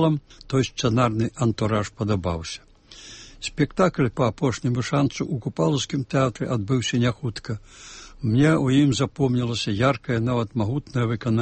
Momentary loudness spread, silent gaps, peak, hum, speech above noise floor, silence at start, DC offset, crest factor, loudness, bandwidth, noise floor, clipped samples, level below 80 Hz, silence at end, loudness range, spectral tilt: 13 LU; none; -6 dBFS; none; 22 dB; 0 s; under 0.1%; 18 dB; -23 LUFS; 8.8 kHz; -45 dBFS; under 0.1%; -48 dBFS; 0 s; 3 LU; -6 dB/octave